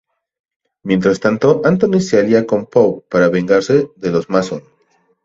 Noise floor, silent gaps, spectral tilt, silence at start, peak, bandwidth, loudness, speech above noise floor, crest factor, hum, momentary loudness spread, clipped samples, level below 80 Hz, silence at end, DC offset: -59 dBFS; none; -6.5 dB/octave; 0.85 s; 0 dBFS; 7.8 kHz; -14 LUFS; 45 dB; 14 dB; none; 6 LU; under 0.1%; -52 dBFS; 0.65 s; under 0.1%